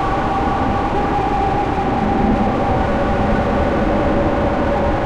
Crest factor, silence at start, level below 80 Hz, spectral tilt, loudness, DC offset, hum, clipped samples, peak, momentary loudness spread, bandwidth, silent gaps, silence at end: 12 dB; 0 s; -26 dBFS; -7.5 dB/octave; -17 LUFS; under 0.1%; none; under 0.1%; -4 dBFS; 2 LU; 10.5 kHz; none; 0 s